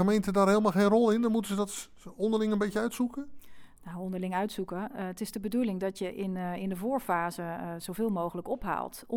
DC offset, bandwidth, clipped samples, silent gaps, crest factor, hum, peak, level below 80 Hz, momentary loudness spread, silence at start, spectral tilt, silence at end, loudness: under 0.1%; 18 kHz; under 0.1%; none; 18 dB; none; -12 dBFS; -58 dBFS; 13 LU; 0 s; -6 dB/octave; 0 s; -30 LUFS